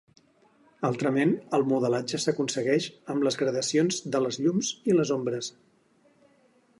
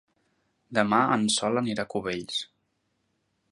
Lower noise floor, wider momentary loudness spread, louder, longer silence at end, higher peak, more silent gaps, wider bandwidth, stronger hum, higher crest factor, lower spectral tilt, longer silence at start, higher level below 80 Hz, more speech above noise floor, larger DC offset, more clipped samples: second, -64 dBFS vs -75 dBFS; second, 6 LU vs 10 LU; about the same, -27 LUFS vs -26 LUFS; first, 1.3 s vs 1.05 s; second, -10 dBFS vs -6 dBFS; neither; about the same, 11.5 kHz vs 11.5 kHz; neither; about the same, 18 dB vs 22 dB; about the same, -4.5 dB/octave vs -3.5 dB/octave; about the same, 0.8 s vs 0.7 s; second, -74 dBFS vs -66 dBFS; second, 37 dB vs 49 dB; neither; neither